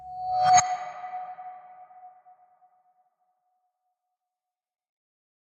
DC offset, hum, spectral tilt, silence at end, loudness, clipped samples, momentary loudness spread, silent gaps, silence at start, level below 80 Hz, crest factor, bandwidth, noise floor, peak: under 0.1%; none; -1 dB/octave; 3.35 s; -25 LUFS; under 0.1%; 24 LU; none; 0 s; -70 dBFS; 26 dB; 11 kHz; -89 dBFS; -6 dBFS